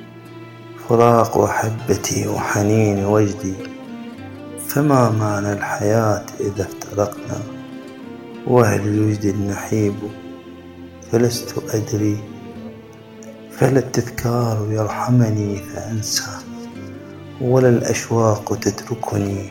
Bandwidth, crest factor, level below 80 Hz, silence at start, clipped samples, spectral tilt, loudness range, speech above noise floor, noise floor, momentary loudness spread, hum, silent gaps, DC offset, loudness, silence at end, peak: 17 kHz; 20 dB; -52 dBFS; 0 s; under 0.1%; -6 dB/octave; 5 LU; 21 dB; -39 dBFS; 21 LU; none; none; under 0.1%; -19 LUFS; 0 s; 0 dBFS